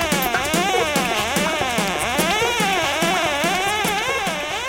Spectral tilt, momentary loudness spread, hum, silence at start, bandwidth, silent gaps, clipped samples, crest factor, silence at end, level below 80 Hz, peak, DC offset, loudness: -2.5 dB/octave; 2 LU; none; 0 s; 17 kHz; none; under 0.1%; 16 dB; 0 s; -44 dBFS; -4 dBFS; under 0.1%; -19 LUFS